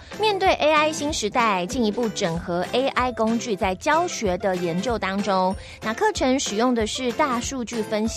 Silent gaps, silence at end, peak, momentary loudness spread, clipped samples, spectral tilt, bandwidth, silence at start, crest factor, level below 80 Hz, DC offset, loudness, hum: none; 0 s; -6 dBFS; 6 LU; under 0.1%; -4 dB/octave; 15 kHz; 0 s; 16 dB; -44 dBFS; under 0.1%; -23 LUFS; none